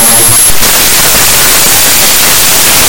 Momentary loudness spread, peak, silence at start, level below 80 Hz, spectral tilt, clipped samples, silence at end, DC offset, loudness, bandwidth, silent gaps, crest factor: 1 LU; 0 dBFS; 0 s; -26 dBFS; -0.5 dB/octave; 10%; 0 s; under 0.1%; -2 LUFS; over 20 kHz; none; 6 dB